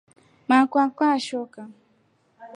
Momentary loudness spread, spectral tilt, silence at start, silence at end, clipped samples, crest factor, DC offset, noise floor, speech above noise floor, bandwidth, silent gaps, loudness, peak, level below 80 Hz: 21 LU; -4 dB/octave; 0.5 s; 0.1 s; under 0.1%; 20 dB; under 0.1%; -64 dBFS; 43 dB; 10.5 kHz; none; -22 LUFS; -6 dBFS; -80 dBFS